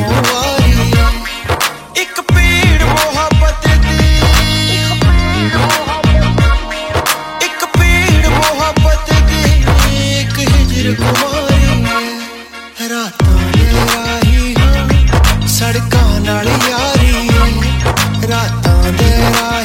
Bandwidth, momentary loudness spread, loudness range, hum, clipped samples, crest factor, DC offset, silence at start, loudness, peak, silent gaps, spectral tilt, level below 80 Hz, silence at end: 16.5 kHz; 5 LU; 2 LU; none; under 0.1%; 10 dB; under 0.1%; 0 s; -11 LUFS; 0 dBFS; none; -4.5 dB/octave; -14 dBFS; 0 s